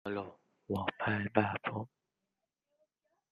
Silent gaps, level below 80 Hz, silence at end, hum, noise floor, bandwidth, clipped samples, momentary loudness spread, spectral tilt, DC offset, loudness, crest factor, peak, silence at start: none; -74 dBFS; 1.45 s; none; -88 dBFS; 9.6 kHz; under 0.1%; 14 LU; -8 dB/octave; under 0.1%; -36 LUFS; 26 dB; -12 dBFS; 0.05 s